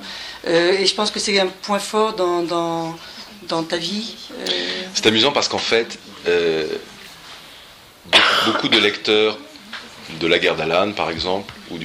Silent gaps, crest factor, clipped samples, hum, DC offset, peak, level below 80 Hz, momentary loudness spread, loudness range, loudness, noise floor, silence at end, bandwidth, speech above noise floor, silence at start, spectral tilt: none; 20 dB; under 0.1%; none; under 0.1%; 0 dBFS; -54 dBFS; 19 LU; 4 LU; -18 LUFS; -44 dBFS; 0 s; 16 kHz; 24 dB; 0 s; -3 dB/octave